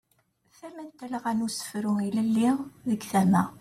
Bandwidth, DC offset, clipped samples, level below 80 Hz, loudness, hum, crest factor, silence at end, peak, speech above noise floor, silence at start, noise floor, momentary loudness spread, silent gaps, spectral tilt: 15.5 kHz; under 0.1%; under 0.1%; -66 dBFS; -27 LUFS; none; 18 dB; 0 s; -10 dBFS; 43 dB; 0.65 s; -69 dBFS; 19 LU; none; -6 dB/octave